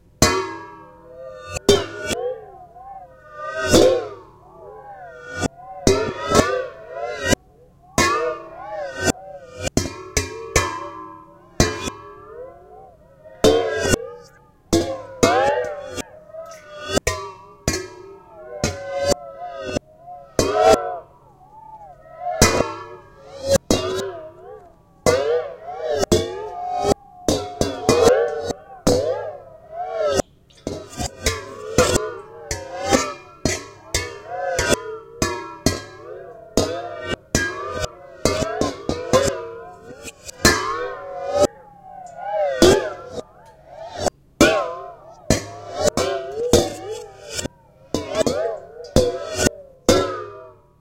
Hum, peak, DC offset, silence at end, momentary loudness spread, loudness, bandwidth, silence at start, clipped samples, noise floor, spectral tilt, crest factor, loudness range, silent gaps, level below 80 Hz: none; 0 dBFS; under 0.1%; 0.3 s; 21 LU; -21 LUFS; 16.5 kHz; 0.2 s; under 0.1%; -51 dBFS; -3.5 dB/octave; 22 dB; 4 LU; none; -38 dBFS